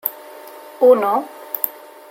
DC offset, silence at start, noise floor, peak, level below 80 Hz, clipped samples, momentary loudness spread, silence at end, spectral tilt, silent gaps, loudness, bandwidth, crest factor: under 0.1%; 0.05 s; -38 dBFS; 0 dBFS; -76 dBFS; under 0.1%; 24 LU; 0.4 s; -4.5 dB/octave; none; -18 LUFS; 17 kHz; 20 dB